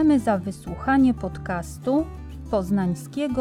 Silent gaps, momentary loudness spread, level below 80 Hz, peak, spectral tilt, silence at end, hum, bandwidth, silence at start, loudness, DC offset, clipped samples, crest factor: none; 11 LU; -42 dBFS; -8 dBFS; -7 dB/octave; 0 s; none; 14 kHz; 0 s; -24 LUFS; under 0.1%; under 0.1%; 14 dB